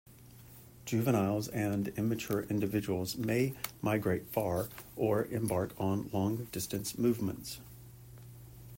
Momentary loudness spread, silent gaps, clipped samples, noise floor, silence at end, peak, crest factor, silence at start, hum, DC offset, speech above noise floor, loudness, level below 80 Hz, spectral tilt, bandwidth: 20 LU; none; under 0.1%; -54 dBFS; 0 s; -16 dBFS; 18 dB; 0.1 s; none; under 0.1%; 21 dB; -34 LUFS; -62 dBFS; -6 dB/octave; 16.5 kHz